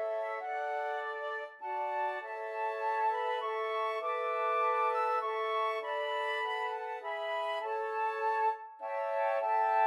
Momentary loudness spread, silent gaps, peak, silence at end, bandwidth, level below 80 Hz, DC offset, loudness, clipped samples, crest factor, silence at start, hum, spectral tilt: 7 LU; none; -18 dBFS; 0 s; 12.5 kHz; under -90 dBFS; under 0.1%; -34 LUFS; under 0.1%; 16 dB; 0 s; none; 0.5 dB/octave